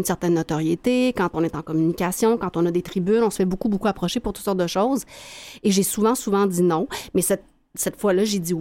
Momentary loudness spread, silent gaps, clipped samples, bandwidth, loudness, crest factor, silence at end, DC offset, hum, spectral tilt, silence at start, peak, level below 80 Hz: 6 LU; none; under 0.1%; 17 kHz; -22 LUFS; 14 dB; 0 s; under 0.1%; none; -5 dB/octave; 0 s; -8 dBFS; -48 dBFS